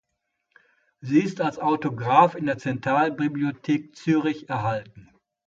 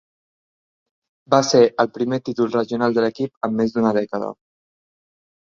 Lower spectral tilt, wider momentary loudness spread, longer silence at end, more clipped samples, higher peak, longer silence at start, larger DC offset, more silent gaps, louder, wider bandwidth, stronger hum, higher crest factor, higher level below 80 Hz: first, -7 dB/octave vs -5 dB/octave; about the same, 9 LU vs 10 LU; second, 0.45 s vs 1.25 s; neither; about the same, -2 dBFS vs -2 dBFS; second, 1.05 s vs 1.3 s; neither; second, none vs 3.37-3.41 s; second, -24 LUFS vs -20 LUFS; about the same, 7.6 kHz vs 7.6 kHz; neither; about the same, 22 dB vs 20 dB; about the same, -64 dBFS vs -64 dBFS